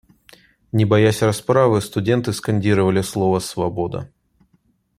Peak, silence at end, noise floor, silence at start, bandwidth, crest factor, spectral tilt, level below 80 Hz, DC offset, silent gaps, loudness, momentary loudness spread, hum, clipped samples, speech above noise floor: -2 dBFS; 0.95 s; -62 dBFS; 0.75 s; 14.5 kHz; 18 dB; -6.5 dB/octave; -52 dBFS; under 0.1%; none; -19 LUFS; 10 LU; none; under 0.1%; 44 dB